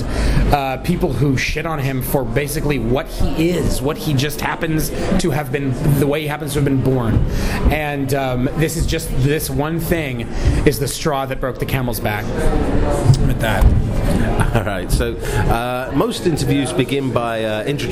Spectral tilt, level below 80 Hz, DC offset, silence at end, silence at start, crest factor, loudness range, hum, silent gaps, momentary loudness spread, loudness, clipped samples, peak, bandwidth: -6 dB/octave; -24 dBFS; under 0.1%; 0 s; 0 s; 16 dB; 2 LU; none; none; 4 LU; -19 LUFS; under 0.1%; 0 dBFS; 16 kHz